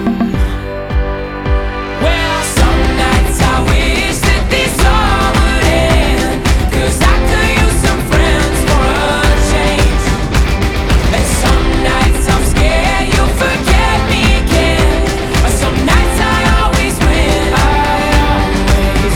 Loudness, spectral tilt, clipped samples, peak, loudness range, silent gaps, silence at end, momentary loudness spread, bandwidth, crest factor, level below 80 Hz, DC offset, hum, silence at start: -12 LUFS; -4.5 dB/octave; under 0.1%; 0 dBFS; 1 LU; none; 0 s; 4 LU; 16.5 kHz; 10 dB; -14 dBFS; under 0.1%; none; 0 s